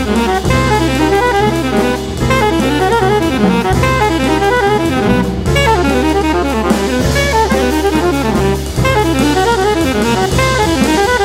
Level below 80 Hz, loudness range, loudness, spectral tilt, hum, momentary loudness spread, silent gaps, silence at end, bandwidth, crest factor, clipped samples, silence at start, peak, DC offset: -24 dBFS; 1 LU; -12 LUFS; -5 dB/octave; none; 2 LU; none; 0 s; 16.5 kHz; 12 dB; under 0.1%; 0 s; 0 dBFS; under 0.1%